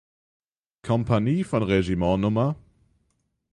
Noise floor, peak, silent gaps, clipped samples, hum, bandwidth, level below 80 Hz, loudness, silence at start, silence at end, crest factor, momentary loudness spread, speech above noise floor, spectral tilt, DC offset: -73 dBFS; -8 dBFS; none; under 0.1%; none; 11 kHz; -46 dBFS; -24 LUFS; 0.85 s; 0.95 s; 18 dB; 5 LU; 50 dB; -8 dB/octave; under 0.1%